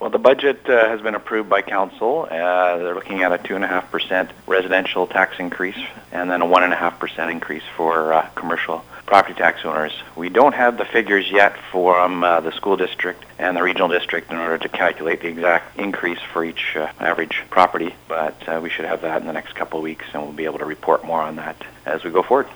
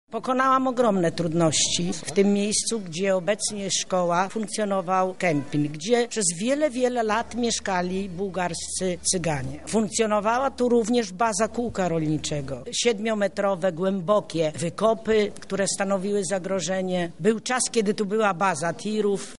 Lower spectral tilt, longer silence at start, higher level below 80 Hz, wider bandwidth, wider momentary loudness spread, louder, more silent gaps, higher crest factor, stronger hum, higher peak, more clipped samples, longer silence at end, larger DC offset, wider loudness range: about the same, -5 dB/octave vs -4 dB/octave; about the same, 0 s vs 0.05 s; about the same, -58 dBFS vs -54 dBFS; first, over 20 kHz vs 11.5 kHz; first, 11 LU vs 6 LU; first, -19 LUFS vs -24 LUFS; neither; about the same, 20 dB vs 16 dB; neither; first, 0 dBFS vs -8 dBFS; neither; about the same, 0 s vs 0 s; second, under 0.1% vs 0.6%; first, 5 LU vs 2 LU